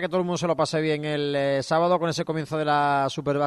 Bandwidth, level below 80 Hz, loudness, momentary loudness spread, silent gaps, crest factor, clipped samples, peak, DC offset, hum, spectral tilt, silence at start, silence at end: 12.5 kHz; -62 dBFS; -24 LUFS; 5 LU; none; 14 dB; under 0.1%; -10 dBFS; under 0.1%; none; -5.5 dB/octave; 0 s; 0 s